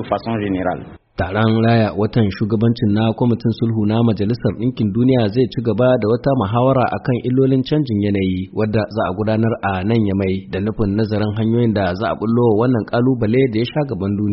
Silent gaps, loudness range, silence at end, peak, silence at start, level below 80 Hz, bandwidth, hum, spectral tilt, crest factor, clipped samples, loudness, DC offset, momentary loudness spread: none; 2 LU; 0 s; -2 dBFS; 0 s; -42 dBFS; 5.8 kHz; none; -7 dB/octave; 14 dB; under 0.1%; -17 LUFS; under 0.1%; 5 LU